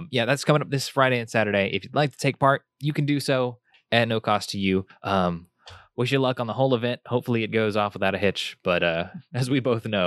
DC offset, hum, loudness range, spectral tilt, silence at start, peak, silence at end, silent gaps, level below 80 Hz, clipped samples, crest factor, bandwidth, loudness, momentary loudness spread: under 0.1%; none; 2 LU; -5.5 dB/octave; 0 s; -2 dBFS; 0 s; none; -62 dBFS; under 0.1%; 22 dB; 13 kHz; -24 LUFS; 6 LU